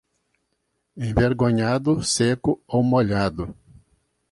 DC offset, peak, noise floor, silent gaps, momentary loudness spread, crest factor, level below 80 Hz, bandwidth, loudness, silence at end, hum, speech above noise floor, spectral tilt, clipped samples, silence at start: under 0.1%; -4 dBFS; -74 dBFS; none; 8 LU; 18 dB; -42 dBFS; 11.5 kHz; -21 LUFS; 0.8 s; none; 53 dB; -5.5 dB/octave; under 0.1%; 0.95 s